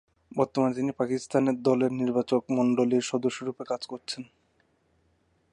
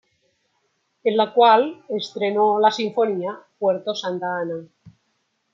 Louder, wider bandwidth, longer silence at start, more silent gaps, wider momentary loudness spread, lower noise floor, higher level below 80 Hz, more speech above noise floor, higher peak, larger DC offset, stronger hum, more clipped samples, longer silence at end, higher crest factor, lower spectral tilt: second, -27 LUFS vs -21 LUFS; first, 10.5 kHz vs 7.6 kHz; second, 0.35 s vs 1.05 s; neither; about the same, 11 LU vs 13 LU; about the same, -69 dBFS vs -71 dBFS; about the same, -70 dBFS vs -74 dBFS; second, 42 dB vs 51 dB; second, -10 dBFS vs -2 dBFS; neither; neither; neither; first, 1.3 s vs 0.65 s; about the same, 18 dB vs 20 dB; about the same, -6 dB/octave vs -5 dB/octave